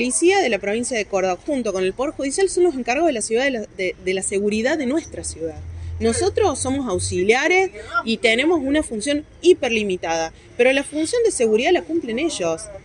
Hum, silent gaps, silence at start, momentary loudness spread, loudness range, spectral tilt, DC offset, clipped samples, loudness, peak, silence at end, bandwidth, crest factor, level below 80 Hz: none; none; 0 s; 8 LU; 3 LU; -3.5 dB/octave; under 0.1%; under 0.1%; -20 LUFS; -2 dBFS; 0.05 s; 11 kHz; 18 dB; -44 dBFS